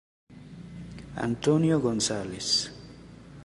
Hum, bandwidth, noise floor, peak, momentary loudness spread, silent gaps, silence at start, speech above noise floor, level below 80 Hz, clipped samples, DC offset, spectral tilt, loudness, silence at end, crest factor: none; 11.5 kHz; -47 dBFS; -10 dBFS; 24 LU; none; 0.3 s; 21 dB; -54 dBFS; under 0.1%; under 0.1%; -4.5 dB/octave; -26 LUFS; 0 s; 18 dB